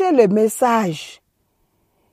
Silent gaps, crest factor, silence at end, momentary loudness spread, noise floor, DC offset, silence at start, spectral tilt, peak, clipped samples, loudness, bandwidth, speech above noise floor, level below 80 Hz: none; 16 dB; 1 s; 17 LU; -66 dBFS; under 0.1%; 0 s; -5.5 dB/octave; -2 dBFS; under 0.1%; -17 LUFS; 15.5 kHz; 50 dB; -68 dBFS